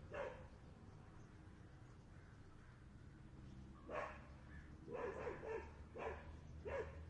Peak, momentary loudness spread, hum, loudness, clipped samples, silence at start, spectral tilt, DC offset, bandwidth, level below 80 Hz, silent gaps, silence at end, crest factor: -34 dBFS; 14 LU; none; -54 LUFS; under 0.1%; 0 s; -7 dB/octave; under 0.1%; 10 kHz; -64 dBFS; none; 0 s; 20 dB